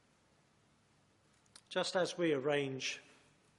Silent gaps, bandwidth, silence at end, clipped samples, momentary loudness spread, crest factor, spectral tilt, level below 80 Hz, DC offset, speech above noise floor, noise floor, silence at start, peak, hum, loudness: none; 11.5 kHz; 0.6 s; under 0.1%; 7 LU; 20 dB; -4 dB/octave; -84 dBFS; under 0.1%; 36 dB; -72 dBFS; 1.7 s; -20 dBFS; none; -36 LUFS